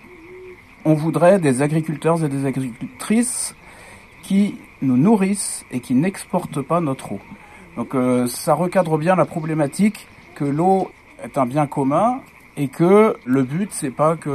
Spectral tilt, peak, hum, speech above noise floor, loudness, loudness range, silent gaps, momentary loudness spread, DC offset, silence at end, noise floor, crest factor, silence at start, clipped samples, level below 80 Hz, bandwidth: -6.5 dB/octave; -2 dBFS; none; 24 dB; -19 LUFS; 3 LU; none; 14 LU; under 0.1%; 0 s; -43 dBFS; 16 dB; 0.1 s; under 0.1%; -56 dBFS; 14.5 kHz